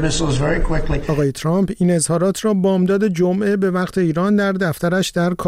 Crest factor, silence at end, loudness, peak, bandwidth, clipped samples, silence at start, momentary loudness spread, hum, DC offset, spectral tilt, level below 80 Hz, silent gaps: 10 dB; 0 s; -18 LUFS; -8 dBFS; 15.5 kHz; under 0.1%; 0 s; 3 LU; none; 0.1%; -6 dB/octave; -28 dBFS; none